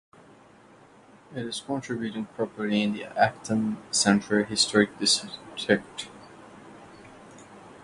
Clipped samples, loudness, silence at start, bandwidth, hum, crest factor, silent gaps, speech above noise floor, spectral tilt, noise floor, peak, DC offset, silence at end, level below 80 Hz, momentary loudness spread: under 0.1%; -26 LUFS; 1.3 s; 11.5 kHz; none; 24 dB; none; 27 dB; -3.5 dB/octave; -54 dBFS; -6 dBFS; under 0.1%; 0 s; -64 dBFS; 22 LU